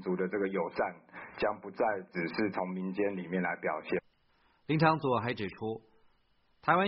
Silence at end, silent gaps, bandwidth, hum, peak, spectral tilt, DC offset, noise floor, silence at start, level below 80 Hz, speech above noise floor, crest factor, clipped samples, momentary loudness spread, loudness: 0 s; none; 5.6 kHz; none; -12 dBFS; -5 dB/octave; under 0.1%; -70 dBFS; 0 s; -68 dBFS; 37 dB; 22 dB; under 0.1%; 10 LU; -33 LUFS